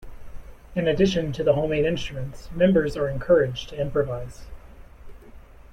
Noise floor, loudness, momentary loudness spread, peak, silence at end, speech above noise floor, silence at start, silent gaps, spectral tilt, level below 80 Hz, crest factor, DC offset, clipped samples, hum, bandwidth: -45 dBFS; -23 LUFS; 13 LU; -6 dBFS; 0.05 s; 22 dB; 0 s; none; -6.5 dB/octave; -42 dBFS; 18 dB; under 0.1%; under 0.1%; none; 12 kHz